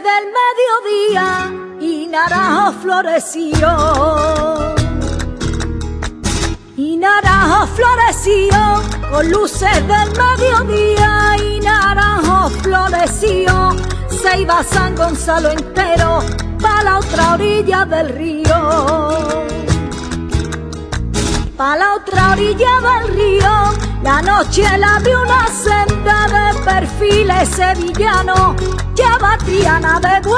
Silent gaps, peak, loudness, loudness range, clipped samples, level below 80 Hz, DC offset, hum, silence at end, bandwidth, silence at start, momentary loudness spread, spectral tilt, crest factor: none; 0 dBFS; -13 LUFS; 4 LU; under 0.1%; -22 dBFS; under 0.1%; none; 0 s; 11 kHz; 0 s; 9 LU; -4.5 dB/octave; 12 dB